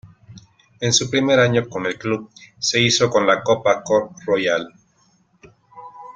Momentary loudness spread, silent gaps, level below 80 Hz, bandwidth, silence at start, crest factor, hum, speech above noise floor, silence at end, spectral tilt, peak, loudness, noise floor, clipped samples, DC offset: 10 LU; none; -58 dBFS; 9.6 kHz; 0.05 s; 18 dB; none; 41 dB; 0.05 s; -3.5 dB/octave; -2 dBFS; -18 LUFS; -60 dBFS; under 0.1%; under 0.1%